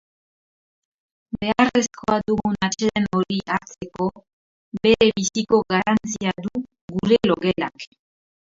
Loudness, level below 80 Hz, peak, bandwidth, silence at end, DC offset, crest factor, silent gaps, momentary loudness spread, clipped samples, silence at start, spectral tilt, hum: -21 LUFS; -52 dBFS; -2 dBFS; 7.8 kHz; 0.7 s; under 0.1%; 22 dB; 4.33-4.72 s, 6.81-6.88 s; 12 LU; under 0.1%; 1.35 s; -4.5 dB/octave; none